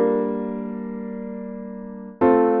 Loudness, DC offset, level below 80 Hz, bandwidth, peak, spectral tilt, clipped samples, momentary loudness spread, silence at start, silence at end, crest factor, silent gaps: -24 LUFS; under 0.1%; -58 dBFS; 3.8 kHz; -4 dBFS; -8 dB/octave; under 0.1%; 17 LU; 0 s; 0 s; 18 dB; none